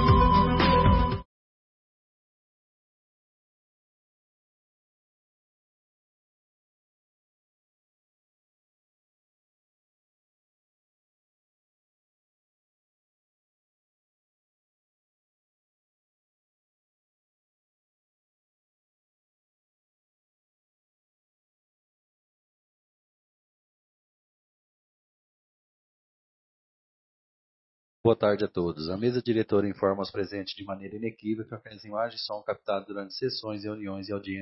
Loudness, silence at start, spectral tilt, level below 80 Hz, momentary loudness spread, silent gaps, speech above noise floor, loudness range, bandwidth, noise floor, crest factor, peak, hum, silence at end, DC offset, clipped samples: -28 LUFS; 0 s; -10 dB/octave; -42 dBFS; 15 LU; 1.25-28.04 s; over 60 dB; 6 LU; 6 kHz; under -90 dBFS; 24 dB; -8 dBFS; none; 0 s; under 0.1%; under 0.1%